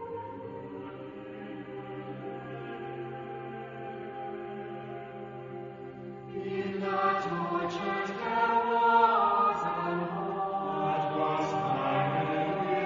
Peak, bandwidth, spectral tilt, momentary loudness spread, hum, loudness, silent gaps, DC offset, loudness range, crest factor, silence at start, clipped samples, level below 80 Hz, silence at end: -12 dBFS; 7.4 kHz; -4.5 dB/octave; 16 LU; none; -31 LUFS; none; under 0.1%; 13 LU; 20 dB; 0 s; under 0.1%; -68 dBFS; 0 s